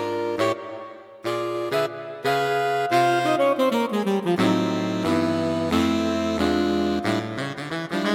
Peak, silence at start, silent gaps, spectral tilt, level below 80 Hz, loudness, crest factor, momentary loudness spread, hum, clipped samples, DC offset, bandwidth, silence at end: -8 dBFS; 0 s; none; -5.5 dB/octave; -52 dBFS; -23 LUFS; 16 dB; 9 LU; none; under 0.1%; under 0.1%; 16.5 kHz; 0 s